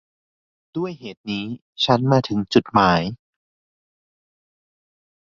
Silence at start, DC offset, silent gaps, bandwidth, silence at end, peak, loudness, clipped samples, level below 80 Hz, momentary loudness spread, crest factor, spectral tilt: 0.75 s; under 0.1%; 1.17-1.24 s, 1.61-1.73 s; 7.4 kHz; 2.05 s; -2 dBFS; -20 LUFS; under 0.1%; -52 dBFS; 15 LU; 22 dB; -6.5 dB/octave